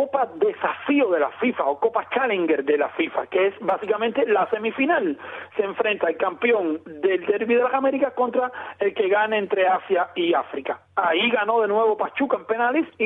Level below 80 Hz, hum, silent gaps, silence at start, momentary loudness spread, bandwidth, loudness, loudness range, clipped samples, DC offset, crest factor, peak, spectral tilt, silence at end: -72 dBFS; none; none; 0 s; 6 LU; 3.9 kHz; -22 LUFS; 1 LU; under 0.1%; under 0.1%; 14 dB; -8 dBFS; -7.5 dB/octave; 0 s